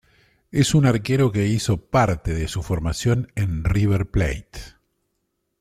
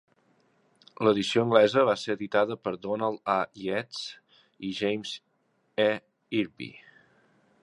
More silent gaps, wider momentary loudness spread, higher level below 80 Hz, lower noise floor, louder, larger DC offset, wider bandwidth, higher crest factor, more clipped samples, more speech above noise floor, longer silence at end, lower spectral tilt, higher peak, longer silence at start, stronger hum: neither; second, 8 LU vs 16 LU; first, -36 dBFS vs -70 dBFS; about the same, -74 dBFS vs -72 dBFS; first, -21 LUFS vs -27 LUFS; neither; first, 14.5 kHz vs 11 kHz; second, 18 dB vs 24 dB; neither; first, 54 dB vs 45 dB; about the same, 0.9 s vs 0.85 s; about the same, -6 dB/octave vs -5 dB/octave; about the same, -4 dBFS vs -4 dBFS; second, 0.55 s vs 1 s; neither